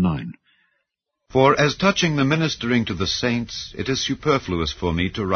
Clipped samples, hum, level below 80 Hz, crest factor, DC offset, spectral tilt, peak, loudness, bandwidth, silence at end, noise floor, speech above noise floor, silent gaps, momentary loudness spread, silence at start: under 0.1%; none; -42 dBFS; 18 dB; under 0.1%; -5 dB/octave; -2 dBFS; -21 LUFS; 6.6 kHz; 0 s; -77 dBFS; 57 dB; none; 8 LU; 0 s